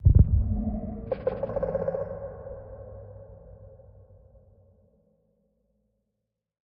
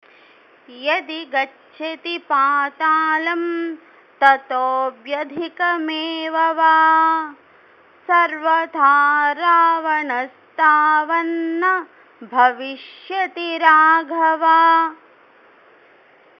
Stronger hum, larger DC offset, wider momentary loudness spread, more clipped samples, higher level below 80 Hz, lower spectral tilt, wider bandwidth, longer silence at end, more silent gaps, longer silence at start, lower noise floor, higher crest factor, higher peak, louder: neither; neither; first, 26 LU vs 14 LU; neither; first, -34 dBFS vs -78 dBFS; first, -11.5 dB/octave vs -3.5 dB/octave; second, 2.8 kHz vs 6.4 kHz; first, 2.95 s vs 1.45 s; neither; second, 0 s vs 0.7 s; first, -83 dBFS vs -51 dBFS; first, 24 dB vs 18 dB; second, -6 dBFS vs 0 dBFS; second, -28 LUFS vs -17 LUFS